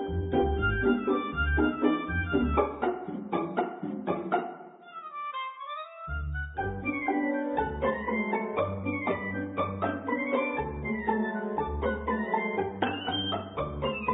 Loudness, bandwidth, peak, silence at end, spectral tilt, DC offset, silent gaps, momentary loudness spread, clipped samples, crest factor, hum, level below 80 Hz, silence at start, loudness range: -30 LUFS; 4 kHz; -12 dBFS; 0 s; -10.5 dB/octave; under 0.1%; none; 10 LU; under 0.1%; 18 dB; none; -40 dBFS; 0 s; 6 LU